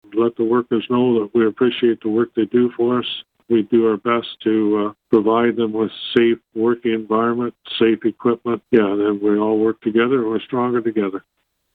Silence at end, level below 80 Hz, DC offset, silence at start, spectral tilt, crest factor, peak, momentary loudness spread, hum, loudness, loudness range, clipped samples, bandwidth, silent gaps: 0.55 s; -60 dBFS; under 0.1%; 0.1 s; -8.5 dB/octave; 16 dB; -2 dBFS; 5 LU; none; -18 LUFS; 1 LU; under 0.1%; 4.4 kHz; none